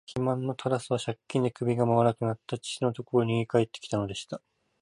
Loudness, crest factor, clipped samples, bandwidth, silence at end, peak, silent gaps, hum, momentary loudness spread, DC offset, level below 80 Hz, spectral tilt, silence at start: -29 LUFS; 18 dB; under 0.1%; 11.5 kHz; 0.45 s; -10 dBFS; none; none; 10 LU; under 0.1%; -62 dBFS; -6.5 dB/octave; 0.1 s